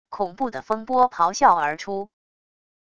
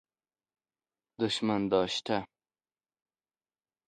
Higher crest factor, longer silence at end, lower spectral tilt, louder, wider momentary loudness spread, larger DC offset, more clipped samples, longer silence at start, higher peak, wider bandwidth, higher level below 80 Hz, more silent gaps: about the same, 20 dB vs 24 dB; second, 0.75 s vs 1.6 s; second, -3.5 dB/octave vs -5 dB/octave; first, -22 LUFS vs -31 LUFS; first, 13 LU vs 6 LU; first, 0.4% vs under 0.1%; neither; second, 0.1 s vs 1.2 s; first, -4 dBFS vs -12 dBFS; second, 9 kHz vs 11 kHz; first, -60 dBFS vs -68 dBFS; neither